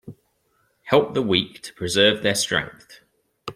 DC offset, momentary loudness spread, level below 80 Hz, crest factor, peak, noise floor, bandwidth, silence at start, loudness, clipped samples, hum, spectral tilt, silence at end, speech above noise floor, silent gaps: under 0.1%; 14 LU; -58 dBFS; 22 dB; -2 dBFS; -67 dBFS; 15.5 kHz; 0.05 s; -21 LUFS; under 0.1%; none; -3.5 dB/octave; 0.05 s; 45 dB; none